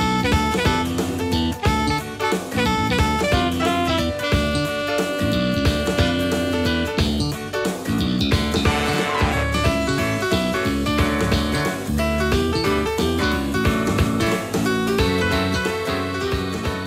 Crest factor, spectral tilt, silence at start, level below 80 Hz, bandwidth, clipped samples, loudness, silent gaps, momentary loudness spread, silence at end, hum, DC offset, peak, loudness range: 16 dB; -5 dB/octave; 0 s; -32 dBFS; 16 kHz; under 0.1%; -21 LUFS; none; 4 LU; 0 s; none; under 0.1%; -4 dBFS; 1 LU